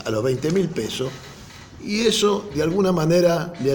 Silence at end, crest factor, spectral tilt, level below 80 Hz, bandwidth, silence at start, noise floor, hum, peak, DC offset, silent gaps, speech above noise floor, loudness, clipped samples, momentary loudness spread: 0 s; 16 dB; -5 dB/octave; -48 dBFS; 17 kHz; 0 s; -41 dBFS; none; -6 dBFS; under 0.1%; none; 21 dB; -21 LUFS; under 0.1%; 20 LU